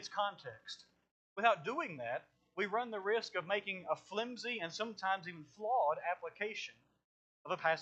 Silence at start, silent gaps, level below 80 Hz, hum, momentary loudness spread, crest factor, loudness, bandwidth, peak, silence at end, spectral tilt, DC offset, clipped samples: 0 s; 1.11-1.36 s, 7.04-7.45 s; -88 dBFS; none; 16 LU; 24 dB; -38 LUFS; 8.6 kHz; -16 dBFS; 0 s; -3.5 dB/octave; under 0.1%; under 0.1%